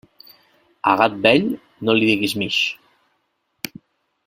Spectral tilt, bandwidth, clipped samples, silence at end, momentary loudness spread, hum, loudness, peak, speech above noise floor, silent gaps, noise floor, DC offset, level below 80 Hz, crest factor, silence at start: -4.5 dB/octave; 16.5 kHz; under 0.1%; 1.5 s; 17 LU; none; -18 LUFS; 0 dBFS; 52 dB; none; -70 dBFS; under 0.1%; -60 dBFS; 22 dB; 0.85 s